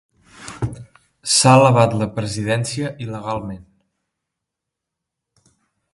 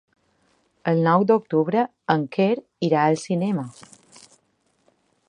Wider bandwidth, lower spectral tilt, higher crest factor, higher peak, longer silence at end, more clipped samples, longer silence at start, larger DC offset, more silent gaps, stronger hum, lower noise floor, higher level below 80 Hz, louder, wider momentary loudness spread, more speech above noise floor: about the same, 11.5 kHz vs 10.5 kHz; second, -4.5 dB/octave vs -7 dB/octave; about the same, 20 dB vs 20 dB; about the same, 0 dBFS vs -2 dBFS; first, 2.3 s vs 1.6 s; neither; second, 0.4 s vs 0.85 s; neither; neither; neither; first, -82 dBFS vs -67 dBFS; first, -50 dBFS vs -70 dBFS; first, -17 LUFS vs -22 LUFS; first, 22 LU vs 7 LU; first, 66 dB vs 46 dB